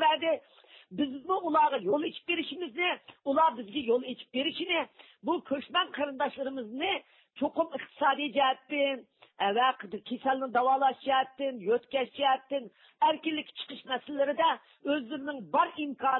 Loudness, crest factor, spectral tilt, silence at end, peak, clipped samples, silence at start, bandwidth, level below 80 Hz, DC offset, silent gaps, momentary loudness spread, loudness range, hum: -30 LUFS; 16 dB; -7.5 dB/octave; 0 s; -14 dBFS; under 0.1%; 0 s; 4.3 kHz; -76 dBFS; under 0.1%; none; 10 LU; 3 LU; none